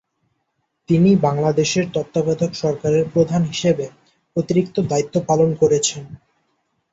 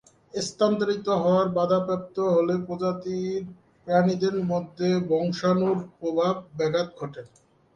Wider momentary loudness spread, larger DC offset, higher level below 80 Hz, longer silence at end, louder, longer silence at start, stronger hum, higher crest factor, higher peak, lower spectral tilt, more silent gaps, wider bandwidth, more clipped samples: second, 7 LU vs 10 LU; neither; first, -54 dBFS vs -64 dBFS; first, 0.75 s vs 0.5 s; first, -18 LUFS vs -25 LUFS; first, 0.9 s vs 0.35 s; neither; about the same, 16 dB vs 18 dB; first, -4 dBFS vs -8 dBFS; about the same, -6 dB/octave vs -6.5 dB/octave; neither; second, 8 kHz vs 10 kHz; neither